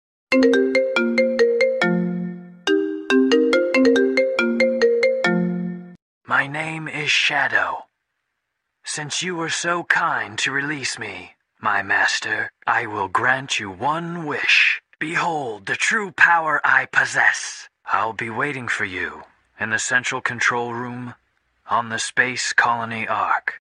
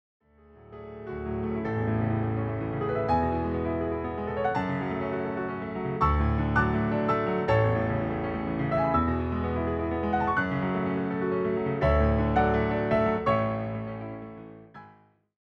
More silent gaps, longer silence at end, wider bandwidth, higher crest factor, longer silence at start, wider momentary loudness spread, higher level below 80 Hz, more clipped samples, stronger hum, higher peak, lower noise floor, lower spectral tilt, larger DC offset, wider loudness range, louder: first, 6.02-6.21 s vs none; second, 0.05 s vs 0.5 s; first, 11 kHz vs 6.4 kHz; about the same, 20 dB vs 16 dB; second, 0.3 s vs 0.55 s; about the same, 11 LU vs 10 LU; second, -66 dBFS vs -38 dBFS; neither; neither; first, 0 dBFS vs -12 dBFS; first, -77 dBFS vs -58 dBFS; second, -3.5 dB/octave vs -9.5 dB/octave; neither; about the same, 5 LU vs 3 LU; first, -20 LUFS vs -28 LUFS